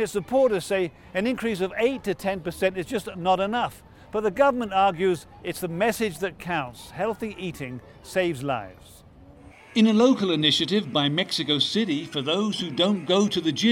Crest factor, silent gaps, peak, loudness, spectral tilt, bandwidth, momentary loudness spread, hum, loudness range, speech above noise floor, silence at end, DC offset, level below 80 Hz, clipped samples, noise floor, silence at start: 18 dB; none; -6 dBFS; -24 LUFS; -5 dB/octave; 17 kHz; 11 LU; none; 7 LU; 24 dB; 0 s; under 0.1%; -56 dBFS; under 0.1%; -48 dBFS; 0 s